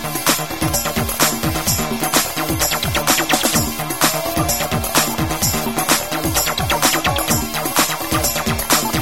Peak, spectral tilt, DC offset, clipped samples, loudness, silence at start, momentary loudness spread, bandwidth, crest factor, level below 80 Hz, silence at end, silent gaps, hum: 0 dBFS; -2.5 dB/octave; 1%; under 0.1%; -17 LUFS; 0 s; 4 LU; 18 kHz; 18 dB; -34 dBFS; 0 s; none; none